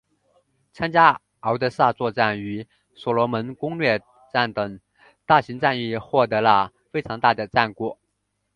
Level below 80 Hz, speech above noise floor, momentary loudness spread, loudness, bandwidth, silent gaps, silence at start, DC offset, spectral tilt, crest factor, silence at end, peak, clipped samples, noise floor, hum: -58 dBFS; 53 dB; 13 LU; -22 LUFS; 10 kHz; none; 0.75 s; under 0.1%; -7 dB/octave; 22 dB; 0.65 s; 0 dBFS; under 0.1%; -75 dBFS; 50 Hz at -60 dBFS